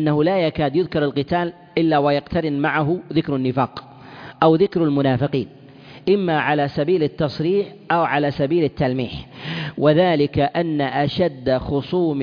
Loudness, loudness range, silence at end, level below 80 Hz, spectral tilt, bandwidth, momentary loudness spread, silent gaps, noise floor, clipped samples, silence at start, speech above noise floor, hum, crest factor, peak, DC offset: -20 LUFS; 1 LU; 0 s; -48 dBFS; -9 dB/octave; 5.2 kHz; 8 LU; none; -39 dBFS; under 0.1%; 0 s; 20 dB; none; 16 dB; -2 dBFS; under 0.1%